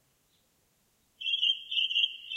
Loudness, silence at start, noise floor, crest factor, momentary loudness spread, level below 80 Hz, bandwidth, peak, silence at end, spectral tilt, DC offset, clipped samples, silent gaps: -27 LUFS; 1.2 s; -71 dBFS; 18 dB; 5 LU; -82 dBFS; 16 kHz; -14 dBFS; 0 s; 3 dB/octave; under 0.1%; under 0.1%; none